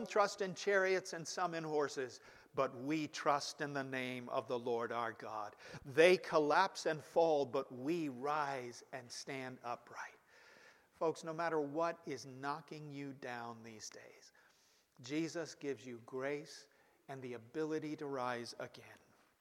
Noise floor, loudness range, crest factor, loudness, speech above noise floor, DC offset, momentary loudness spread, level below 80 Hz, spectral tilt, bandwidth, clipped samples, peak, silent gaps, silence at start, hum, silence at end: -72 dBFS; 11 LU; 24 dB; -39 LUFS; 33 dB; under 0.1%; 17 LU; -84 dBFS; -4.5 dB/octave; 15.5 kHz; under 0.1%; -14 dBFS; none; 0 s; none; 0.45 s